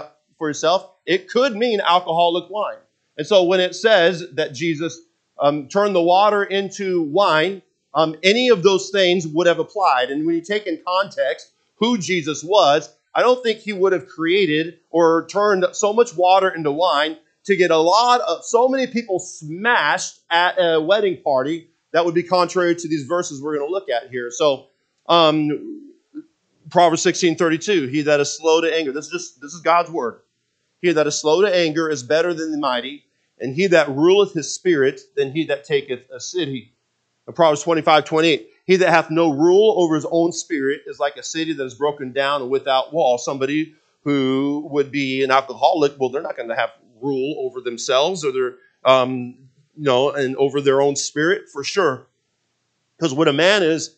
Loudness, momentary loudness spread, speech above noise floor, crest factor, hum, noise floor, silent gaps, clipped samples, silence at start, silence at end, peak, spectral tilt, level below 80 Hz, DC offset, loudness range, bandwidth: -19 LUFS; 11 LU; 52 dB; 18 dB; none; -71 dBFS; none; under 0.1%; 0 s; 0.1 s; 0 dBFS; -4 dB/octave; -74 dBFS; under 0.1%; 4 LU; 9 kHz